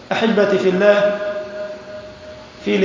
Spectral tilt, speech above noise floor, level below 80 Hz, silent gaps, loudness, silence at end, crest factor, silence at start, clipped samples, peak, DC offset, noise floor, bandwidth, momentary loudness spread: -6 dB/octave; 22 dB; -54 dBFS; none; -17 LUFS; 0 s; 16 dB; 0 s; under 0.1%; -2 dBFS; under 0.1%; -37 dBFS; 7.6 kHz; 22 LU